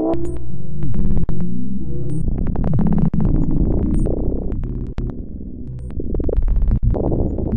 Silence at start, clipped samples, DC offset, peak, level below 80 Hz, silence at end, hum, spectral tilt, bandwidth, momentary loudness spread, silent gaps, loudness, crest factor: 0 s; under 0.1%; under 0.1%; -4 dBFS; -22 dBFS; 0 s; none; -11 dB/octave; 9.2 kHz; 12 LU; none; -22 LUFS; 10 dB